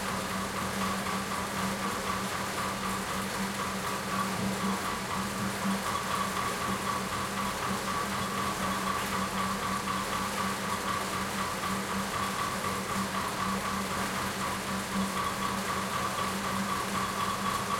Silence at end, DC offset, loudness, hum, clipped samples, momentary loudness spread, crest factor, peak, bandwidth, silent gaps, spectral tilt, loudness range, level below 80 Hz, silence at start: 0 s; under 0.1%; -31 LUFS; none; under 0.1%; 2 LU; 16 dB; -16 dBFS; 16.5 kHz; none; -3.5 dB/octave; 1 LU; -54 dBFS; 0 s